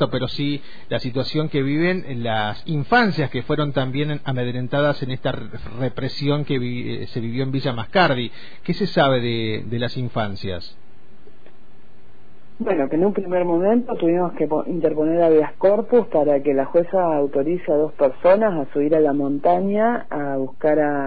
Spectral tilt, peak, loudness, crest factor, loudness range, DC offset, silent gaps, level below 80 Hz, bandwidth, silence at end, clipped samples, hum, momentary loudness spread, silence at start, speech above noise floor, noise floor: -8.5 dB/octave; -4 dBFS; -21 LUFS; 16 dB; 6 LU; 4%; none; -52 dBFS; 5 kHz; 0 s; under 0.1%; none; 9 LU; 0 s; 32 dB; -52 dBFS